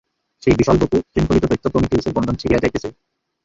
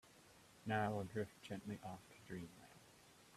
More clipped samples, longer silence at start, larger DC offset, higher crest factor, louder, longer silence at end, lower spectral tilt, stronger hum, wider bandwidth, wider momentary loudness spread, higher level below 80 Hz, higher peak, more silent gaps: neither; first, 0.45 s vs 0.05 s; neither; second, 18 dB vs 24 dB; first, -18 LUFS vs -47 LUFS; first, 0.55 s vs 0 s; about the same, -7 dB/octave vs -6 dB/octave; neither; second, 7.8 kHz vs 14.5 kHz; second, 7 LU vs 24 LU; first, -34 dBFS vs -76 dBFS; first, 0 dBFS vs -24 dBFS; neither